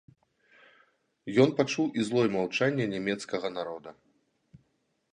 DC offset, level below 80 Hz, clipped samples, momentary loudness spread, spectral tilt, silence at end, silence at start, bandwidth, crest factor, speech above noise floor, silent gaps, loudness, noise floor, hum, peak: under 0.1%; -72 dBFS; under 0.1%; 15 LU; -5.5 dB/octave; 1.2 s; 1.25 s; 10.5 kHz; 22 dB; 46 dB; none; -28 LUFS; -74 dBFS; none; -8 dBFS